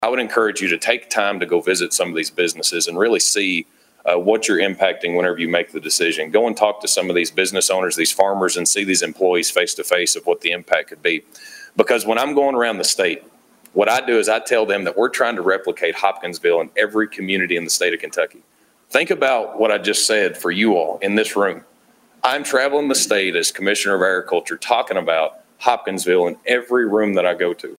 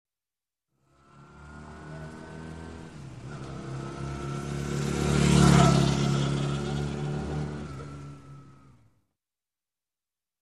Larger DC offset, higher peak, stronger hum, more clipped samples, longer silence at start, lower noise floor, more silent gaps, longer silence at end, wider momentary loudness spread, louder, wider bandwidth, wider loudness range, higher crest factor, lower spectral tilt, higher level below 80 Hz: neither; first, 0 dBFS vs -6 dBFS; neither; neither; second, 0 s vs 1.15 s; second, -54 dBFS vs under -90 dBFS; neither; second, 0.05 s vs 1.9 s; second, 5 LU vs 24 LU; first, -18 LUFS vs -26 LUFS; first, 16 kHz vs 12.5 kHz; second, 2 LU vs 19 LU; about the same, 18 dB vs 22 dB; second, -2 dB/octave vs -6 dB/octave; second, -66 dBFS vs -42 dBFS